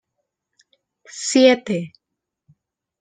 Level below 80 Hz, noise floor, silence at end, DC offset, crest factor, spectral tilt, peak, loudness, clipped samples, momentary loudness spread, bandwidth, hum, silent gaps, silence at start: -70 dBFS; -78 dBFS; 1.1 s; under 0.1%; 20 dB; -4 dB/octave; -2 dBFS; -18 LUFS; under 0.1%; 23 LU; 9.6 kHz; none; none; 1.15 s